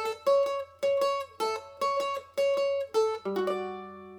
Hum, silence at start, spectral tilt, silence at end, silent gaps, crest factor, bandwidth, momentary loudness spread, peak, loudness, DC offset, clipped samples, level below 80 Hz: none; 0 s; -3.5 dB/octave; 0 s; none; 14 dB; 18 kHz; 6 LU; -16 dBFS; -29 LUFS; under 0.1%; under 0.1%; -76 dBFS